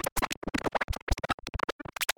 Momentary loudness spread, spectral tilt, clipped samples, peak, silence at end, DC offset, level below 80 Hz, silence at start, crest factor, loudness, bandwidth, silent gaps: 3 LU; -3.5 dB/octave; under 0.1%; -10 dBFS; 0.05 s; under 0.1%; -38 dBFS; 0.05 s; 22 dB; -33 LUFS; over 20 kHz; 0.12-0.16 s, 0.37-0.42 s, 0.84-0.88 s, 1.02-1.07 s, 1.34-1.38 s, 1.72-1.79 s